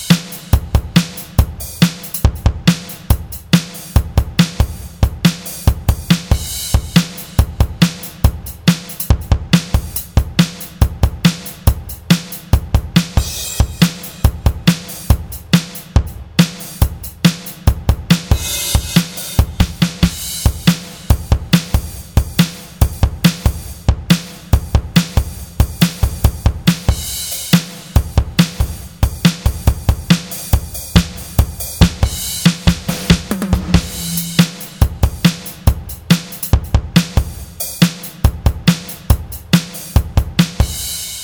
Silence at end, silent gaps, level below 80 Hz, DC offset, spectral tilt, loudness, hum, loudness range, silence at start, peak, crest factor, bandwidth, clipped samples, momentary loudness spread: 0 s; none; -20 dBFS; under 0.1%; -5 dB/octave; -16 LUFS; none; 1 LU; 0 s; 0 dBFS; 16 dB; over 20 kHz; under 0.1%; 5 LU